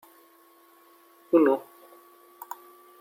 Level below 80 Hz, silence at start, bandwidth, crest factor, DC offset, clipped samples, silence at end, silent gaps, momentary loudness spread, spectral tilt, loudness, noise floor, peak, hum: -88 dBFS; 1.3 s; 16.5 kHz; 22 dB; under 0.1%; under 0.1%; 1.4 s; none; 22 LU; -6.5 dB/octave; -24 LUFS; -58 dBFS; -8 dBFS; none